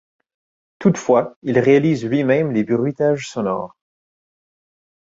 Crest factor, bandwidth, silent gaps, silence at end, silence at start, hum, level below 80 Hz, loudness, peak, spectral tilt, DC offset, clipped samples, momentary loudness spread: 18 dB; 7.8 kHz; 1.36-1.42 s; 1.45 s; 0.8 s; none; -60 dBFS; -18 LUFS; -2 dBFS; -7 dB/octave; under 0.1%; under 0.1%; 8 LU